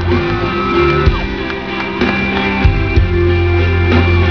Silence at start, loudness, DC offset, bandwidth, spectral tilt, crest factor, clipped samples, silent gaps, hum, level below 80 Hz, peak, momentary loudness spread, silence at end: 0 s; -14 LUFS; 1%; 5.4 kHz; -8 dB/octave; 12 dB; under 0.1%; none; none; -20 dBFS; 0 dBFS; 7 LU; 0 s